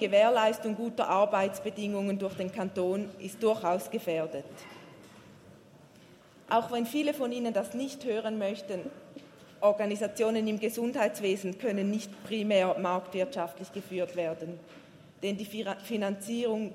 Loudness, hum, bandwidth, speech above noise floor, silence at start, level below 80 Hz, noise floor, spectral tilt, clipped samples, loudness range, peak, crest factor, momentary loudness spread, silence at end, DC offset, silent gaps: -31 LUFS; none; 16 kHz; 26 dB; 0 s; -78 dBFS; -56 dBFS; -5 dB/octave; under 0.1%; 5 LU; -12 dBFS; 20 dB; 12 LU; 0 s; under 0.1%; none